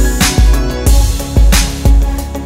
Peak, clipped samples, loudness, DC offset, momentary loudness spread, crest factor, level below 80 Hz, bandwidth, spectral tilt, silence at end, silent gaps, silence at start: 0 dBFS; under 0.1%; -12 LUFS; under 0.1%; 4 LU; 10 dB; -10 dBFS; 16.5 kHz; -4.5 dB/octave; 0 s; none; 0 s